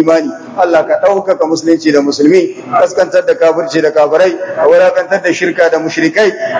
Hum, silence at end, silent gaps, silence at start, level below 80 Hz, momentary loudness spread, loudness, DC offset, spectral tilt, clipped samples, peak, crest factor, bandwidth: none; 0 s; none; 0 s; -60 dBFS; 4 LU; -10 LUFS; under 0.1%; -4.5 dB/octave; 1%; 0 dBFS; 10 dB; 8 kHz